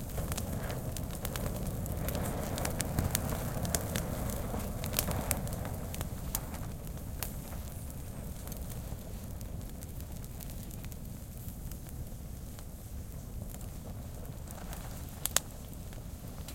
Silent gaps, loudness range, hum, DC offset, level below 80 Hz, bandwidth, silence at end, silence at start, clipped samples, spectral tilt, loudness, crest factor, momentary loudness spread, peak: none; 10 LU; none; under 0.1%; -44 dBFS; 17 kHz; 0 s; 0 s; under 0.1%; -4.5 dB/octave; -38 LUFS; 34 dB; 12 LU; -4 dBFS